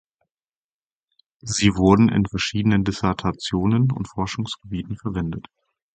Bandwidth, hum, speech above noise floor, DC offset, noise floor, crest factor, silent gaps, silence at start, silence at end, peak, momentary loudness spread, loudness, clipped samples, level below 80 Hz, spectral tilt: 9.2 kHz; none; over 69 dB; under 0.1%; under -90 dBFS; 20 dB; none; 1.45 s; 0.55 s; -2 dBFS; 14 LU; -21 LUFS; under 0.1%; -42 dBFS; -5.5 dB/octave